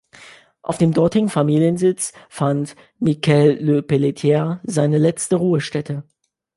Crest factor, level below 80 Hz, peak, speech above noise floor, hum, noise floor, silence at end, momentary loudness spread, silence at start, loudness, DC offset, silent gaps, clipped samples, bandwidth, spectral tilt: 16 dB; -56 dBFS; -2 dBFS; 27 dB; none; -45 dBFS; 0.55 s; 10 LU; 0.25 s; -18 LUFS; under 0.1%; none; under 0.1%; 11.5 kHz; -6.5 dB/octave